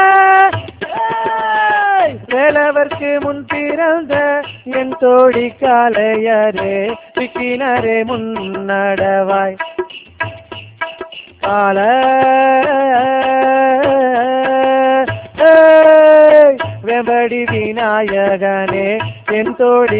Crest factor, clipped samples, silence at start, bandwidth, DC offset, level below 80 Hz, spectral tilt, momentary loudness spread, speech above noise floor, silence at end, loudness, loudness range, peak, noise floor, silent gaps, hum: 12 dB; 0.2%; 0 s; 4 kHz; under 0.1%; -48 dBFS; -9 dB/octave; 14 LU; 19 dB; 0 s; -12 LUFS; 8 LU; 0 dBFS; -32 dBFS; none; none